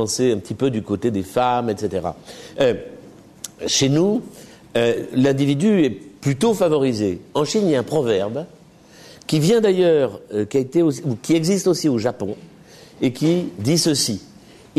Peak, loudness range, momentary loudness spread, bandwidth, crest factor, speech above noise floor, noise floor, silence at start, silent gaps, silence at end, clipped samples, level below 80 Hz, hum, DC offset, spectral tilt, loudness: -6 dBFS; 3 LU; 13 LU; 13.5 kHz; 14 dB; 27 dB; -46 dBFS; 0 s; none; 0.55 s; under 0.1%; -56 dBFS; none; under 0.1%; -5 dB/octave; -20 LUFS